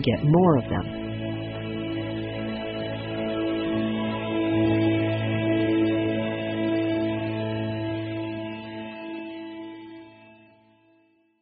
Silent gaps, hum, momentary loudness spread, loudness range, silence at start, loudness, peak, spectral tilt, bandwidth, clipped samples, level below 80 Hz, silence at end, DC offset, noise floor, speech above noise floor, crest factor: none; none; 14 LU; 9 LU; 0 s; -26 LUFS; -8 dBFS; -6 dB/octave; 5 kHz; under 0.1%; -52 dBFS; 1.1 s; under 0.1%; -63 dBFS; 42 dB; 18 dB